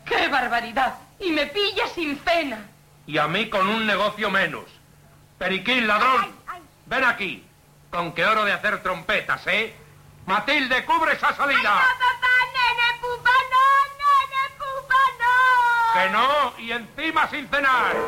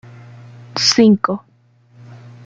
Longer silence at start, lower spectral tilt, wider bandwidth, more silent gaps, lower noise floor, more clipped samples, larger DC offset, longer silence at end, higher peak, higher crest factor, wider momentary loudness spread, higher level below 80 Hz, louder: second, 0.05 s vs 0.75 s; about the same, -3.5 dB/octave vs -4 dB/octave; first, 16.5 kHz vs 8.8 kHz; neither; about the same, -52 dBFS vs -52 dBFS; neither; neither; second, 0 s vs 0.3 s; second, -8 dBFS vs -2 dBFS; about the same, 14 dB vs 18 dB; second, 11 LU vs 16 LU; first, -54 dBFS vs -60 dBFS; second, -21 LUFS vs -14 LUFS